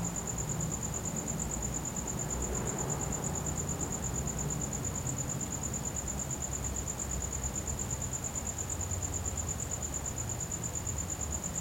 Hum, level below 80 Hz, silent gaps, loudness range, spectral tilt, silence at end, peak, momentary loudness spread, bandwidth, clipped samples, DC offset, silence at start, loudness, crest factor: none; -44 dBFS; none; 1 LU; -4 dB/octave; 0 s; -20 dBFS; 1 LU; 16.5 kHz; under 0.1%; under 0.1%; 0 s; -34 LUFS; 16 dB